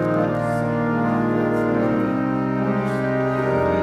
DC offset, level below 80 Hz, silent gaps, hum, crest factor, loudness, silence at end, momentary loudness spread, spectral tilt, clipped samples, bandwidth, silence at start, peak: under 0.1%; -48 dBFS; none; none; 12 dB; -21 LUFS; 0 s; 2 LU; -8.5 dB/octave; under 0.1%; 13 kHz; 0 s; -8 dBFS